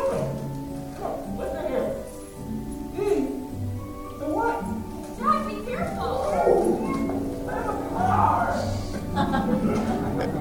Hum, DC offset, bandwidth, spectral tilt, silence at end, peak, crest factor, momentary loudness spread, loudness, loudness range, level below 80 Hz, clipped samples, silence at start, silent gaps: none; under 0.1%; 17 kHz; -7 dB/octave; 0 s; -8 dBFS; 18 dB; 12 LU; -26 LUFS; 5 LU; -42 dBFS; under 0.1%; 0 s; none